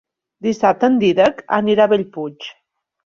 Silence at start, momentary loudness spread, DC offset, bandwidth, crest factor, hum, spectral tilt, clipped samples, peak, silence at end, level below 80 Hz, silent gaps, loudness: 0.45 s; 14 LU; under 0.1%; 7.4 kHz; 16 dB; none; -6 dB/octave; under 0.1%; -2 dBFS; 0.55 s; -58 dBFS; none; -16 LUFS